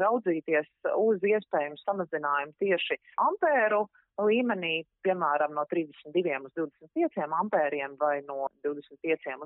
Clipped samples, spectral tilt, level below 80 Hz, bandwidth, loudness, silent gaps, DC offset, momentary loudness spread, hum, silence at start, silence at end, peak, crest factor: under 0.1%; -3 dB/octave; -84 dBFS; 4 kHz; -29 LUFS; none; under 0.1%; 8 LU; none; 0 s; 0 s; -14 dBFS; 16 dB